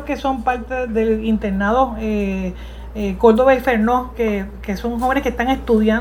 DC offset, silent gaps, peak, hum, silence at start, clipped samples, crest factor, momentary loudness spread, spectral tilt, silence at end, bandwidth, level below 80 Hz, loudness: under 0.1%; none; 0 dBFS; none; 0 s; under 0.1%; 18 dB; 11 LU; -7 dB/octave; 0 s; 15.5 kHz; -32 dBFS; -18 LUFS